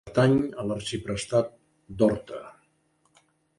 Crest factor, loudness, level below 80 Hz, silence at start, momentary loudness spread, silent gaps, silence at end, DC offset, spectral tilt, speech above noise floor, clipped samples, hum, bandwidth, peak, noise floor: 20 dB; -26 LUFS; -54 dBFS; 0.05 s; 18 LU; none; 1.05 s; under 0.1%; -6 dB/octave; 43 dB; under 0.1%; none; 11.5 kHz; -8 dBFS; -69 dBFS